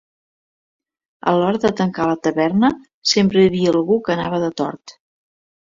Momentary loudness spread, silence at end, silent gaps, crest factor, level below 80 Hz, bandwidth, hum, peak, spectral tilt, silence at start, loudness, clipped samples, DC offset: 8 LU; 0.75 s; 2.94-3.02 s; 16 dB; -54 dBFS; 7.6 kHz; none; -2 dBFS; -5.5 dB/octave; 1.25 s; -18 LUFS; under 0.1%; under 0.1%